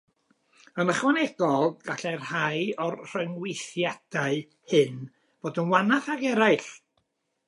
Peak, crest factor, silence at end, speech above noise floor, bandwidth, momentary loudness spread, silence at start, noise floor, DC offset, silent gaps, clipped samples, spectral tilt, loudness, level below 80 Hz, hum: -6 dBFS; 20 dB; 0.7 s; 48 dB; 11.5 kHz; 11 LU; 0.75 s; -75 dBFS; under 0.1%; none; under 0.1%; -5 dB/octave; -26 LUFS; -80 dBFS; none